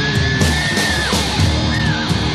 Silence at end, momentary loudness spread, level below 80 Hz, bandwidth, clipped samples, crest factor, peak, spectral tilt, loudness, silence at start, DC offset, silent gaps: 0 s; 2 LU; -26 dBFS; 13.5 kHz; under 0.1%; 12 dB; -4 dBFS; -4 dB/octave; -16 LUFS; 0 s; under 0.1%; none